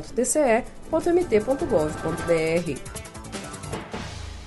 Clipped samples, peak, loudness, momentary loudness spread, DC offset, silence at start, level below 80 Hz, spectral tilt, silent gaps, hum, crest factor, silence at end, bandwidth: under 0.1%; -8 dBFS; -24 LUFS; 14 LU; under 0.1%; 0 s; -42 dBFS; -5 dB/octave; none; none; 16 dB; 0 s; 12 kHz